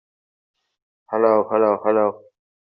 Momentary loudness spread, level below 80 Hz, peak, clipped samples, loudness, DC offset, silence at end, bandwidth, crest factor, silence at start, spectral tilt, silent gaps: 6 LU; -72 dBFS; -4 dBFS; under 0.1%; -19 LUFS; under 0.1%; 0.55 s; 5.2 kHz; 18 dB; 1.1 s; -6.5 dB/octave; none